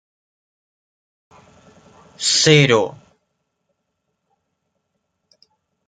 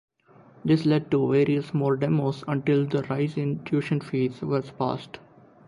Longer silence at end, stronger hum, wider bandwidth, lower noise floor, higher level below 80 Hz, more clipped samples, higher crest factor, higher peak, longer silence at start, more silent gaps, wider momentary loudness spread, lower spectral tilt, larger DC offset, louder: first, 2.95 s vs 0.5 s; neither; about the same, 9.6 kHz vs 10.5 kHz; first, -74 dBFS vs -54 dBFS; about the same, -62 dBFS vs -62 dBFS; neither; first, 22 dB vs 16 dB; first, 0 dBFS vs -10 dBFS; first, 2.2 s vs 0.65 s; neither; first, 11 LU vs 7 LU; second, -3.5 dB/octave vs -8.5 dB/octave; neither; first, -15 LUFS vs -25 LUFS